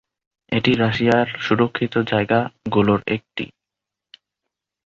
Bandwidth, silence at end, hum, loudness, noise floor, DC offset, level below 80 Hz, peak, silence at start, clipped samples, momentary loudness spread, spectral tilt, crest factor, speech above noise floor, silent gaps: 7.4 kHz; 1.4 s; none; -19 LUFS; -85 dBFS; under 0.1%; -52 dBFS; -2 dBFS; 0.5 s; under 0.1%; 8 LU; -7 dB/octave; 20 dB; 66 dB; none